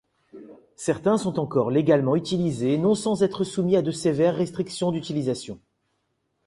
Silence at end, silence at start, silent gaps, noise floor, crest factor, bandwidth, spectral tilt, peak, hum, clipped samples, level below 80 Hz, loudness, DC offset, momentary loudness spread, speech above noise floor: 0.9 s; 0.35 s; none; -74 dBFS; 18 dB; 11.5 kHz; -6.5 dB/octave; -6 dBFS; none; under 0.1%; -60 dBFS; -24 LUFS; under 0.1%; 7 LU; 51 dB